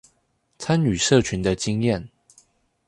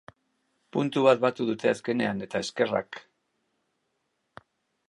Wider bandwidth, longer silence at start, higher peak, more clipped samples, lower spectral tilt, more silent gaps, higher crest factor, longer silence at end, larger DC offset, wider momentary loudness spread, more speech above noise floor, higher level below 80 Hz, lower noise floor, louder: about the same, 11.5 kHz vs 11.5 kHz; second, 0.6 s vs 0.75 s; about the same, -4 dBFS vs -6 dBFS; neither; about the same, -5 dB/octave vs -5.5 dB/octave; neither; about the same, 20 dB vs 22 dB; second, 0.8 s vs 1.9 s; neither; second, 8 LU vs 11 LU; about the same, 48 dB vs 51 dB; first, -46 dBFS vs -70 dBFS; second, -68 dBFS vs -77 dBFS; first, -22 LUFS vs -26 LUFS